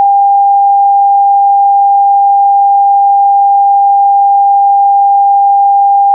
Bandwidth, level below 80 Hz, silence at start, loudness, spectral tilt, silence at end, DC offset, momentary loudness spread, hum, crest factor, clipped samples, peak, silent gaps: 1 kHz; under -90 dBFS; 0 s; -7 LUFS; -7 dB/octave; 0 s; under 0.1%; 0 LU; none; 4 dB; under 0.1%; -2 dBFS; none